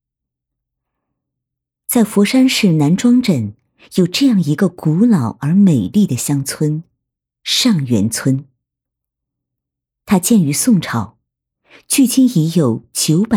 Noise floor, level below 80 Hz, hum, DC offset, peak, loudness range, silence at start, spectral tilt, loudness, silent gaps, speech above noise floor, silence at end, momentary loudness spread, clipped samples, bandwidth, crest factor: -81 dBFS; -56 dBFS; none; under 0.1%; -2 dBFS; 4 LU; 1.9 s; -5 dB/octave; -14 LUFS; none; 68 dB; 0 s; 8 LU; under 0.1%; 17.5 kHz; 14 dB